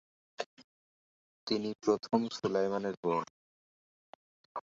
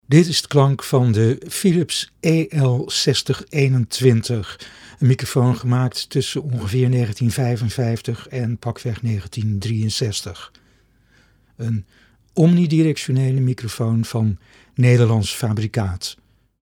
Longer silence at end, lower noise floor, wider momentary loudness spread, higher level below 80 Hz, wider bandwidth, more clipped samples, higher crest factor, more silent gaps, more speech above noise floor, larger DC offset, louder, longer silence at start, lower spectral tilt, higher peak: second, 0.1 s vs 0.5 s; first, under -90 dBFS vs -57 dBFS; first, 14 LU vs 10 LU; second, -74 dBFS vs -50 dBFS; second, 7.8 kHz vs 17 kHz; neither; first, 24 dB vs 18 dB; first, 0.46-0.57 s, 0.64-1.47 s, 1.75-1.79 s, 2.97-3.03 s, 3.30-4.55 s vs none; first, over 58 dB vs 38 dB; neither; second, -34 LUFS vs -19 LUFS; first, 0.4 s vs 0.1 s; about the same, -5.5 dB/octave vs -6 dB/octave; second, -12 dBFS vs 0 dBFS